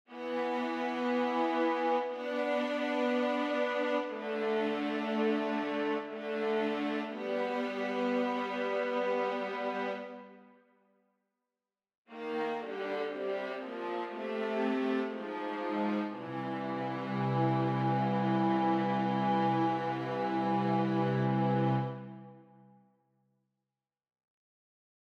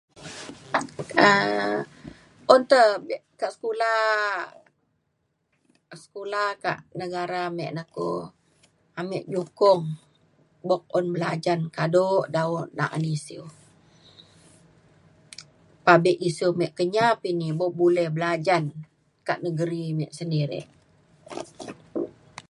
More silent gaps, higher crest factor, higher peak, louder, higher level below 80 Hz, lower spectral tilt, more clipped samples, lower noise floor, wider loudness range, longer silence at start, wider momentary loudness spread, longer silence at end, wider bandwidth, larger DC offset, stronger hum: first, 11.97-12.05 s vs none; second, 16 dB vs 24 dB; second, -18 dBFS vs 0 dBFS; second, -33 LUFS vs -24 LUFS; second, -82 dBFS vs -68 dBFS; first, -7.5 dB/octave vs -6 dB/octave; neither; first, under -90 dBFS vs -74 dBFS; about the same, 8 LU vs 9 LU; about the same, 0.1 s vs 0.15 s; second, 8 LU vs 21 LU; first, 2.65 s vs 0.1 s; second, 8.4 kHz vs 11.5 kHz; neither; neither